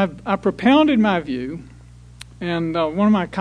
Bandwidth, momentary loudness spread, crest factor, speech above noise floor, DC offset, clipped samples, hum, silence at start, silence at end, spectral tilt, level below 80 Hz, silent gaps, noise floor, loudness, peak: 10.5 kHz; 14 LU; 18 dB; 24 dB; under 0.1%; under 0.1%; 60 Hz at -45 dBFS; 0 s; 0 s; -7 dB/octave; -48 dBFS; none; -43 dBFS; -19 LUFS; -2 dBFS